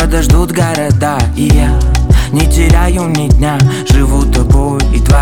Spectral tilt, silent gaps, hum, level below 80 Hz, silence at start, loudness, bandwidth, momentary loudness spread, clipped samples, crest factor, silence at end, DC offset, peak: -6 dB/octave; none; none; -12 dBFS; 0 s; -11 LUFS; 17 kHz; 3 LU; under 0.1%; 8 dB; 0 s; 0.9%; 0 dBFS